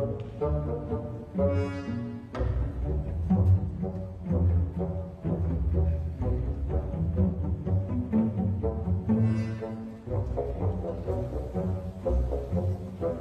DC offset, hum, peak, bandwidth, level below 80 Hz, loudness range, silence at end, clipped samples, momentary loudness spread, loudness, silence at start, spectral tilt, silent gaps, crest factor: under 0.1%; none; -14 dBFS; 5.4 kHz; -36 dBFS; 3 LU; 0 s; under 0.1%; 8 LU; -30 LUFS; 0 s; -10.5 dB/octave; none; 14 dB